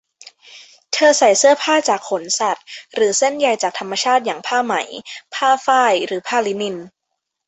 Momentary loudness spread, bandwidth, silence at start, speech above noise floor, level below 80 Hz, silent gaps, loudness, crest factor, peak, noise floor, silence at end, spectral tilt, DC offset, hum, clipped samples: 13 LU; 8.4 kHz; 0.5 s; 60 dB; -68 dBFS; none; -17 LUFS; 16 dB; -2 dBFS; -77 dBFS; 0.6 s; -1.5 dB/octave; under 0.1%; none; under 0.1%